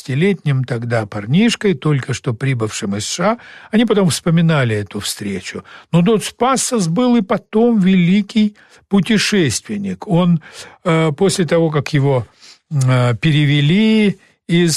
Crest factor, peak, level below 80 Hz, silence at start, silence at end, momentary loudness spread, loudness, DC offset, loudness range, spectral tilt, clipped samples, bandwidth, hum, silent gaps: 10 dB; -4 dBFS; -50 dBFS; 0.1 s; 0 s; 9 LU; -16 LUFS; under 0.1%; 2 LU; -5.5 dB/octave; under 0.1%; 13 kHz; none; none